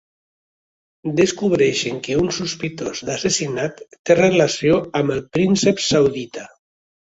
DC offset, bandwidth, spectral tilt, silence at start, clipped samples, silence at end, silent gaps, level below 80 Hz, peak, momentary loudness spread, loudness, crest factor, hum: under 0.1%; 8.2 kHz; -4.5 dB/octave; 1.05 s; under 0.1%; 0.65 s; 3.99-4.05 s; -52 dBFS; -2 dBFS; 11 LU; -19 LUFS; 18 dB; none